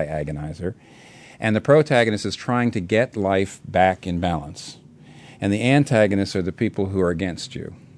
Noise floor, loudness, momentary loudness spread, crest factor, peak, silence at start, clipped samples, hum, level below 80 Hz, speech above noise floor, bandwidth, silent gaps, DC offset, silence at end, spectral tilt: -45 dBFS; -21 LUFS; 14 LU; 18 dB; -2 dBFS; 0 s; under 0.1%; none; -48 dBFS; 24 dB; 11 kHz; none; under 0.1%; 0.2 s; -6.5 dB/octave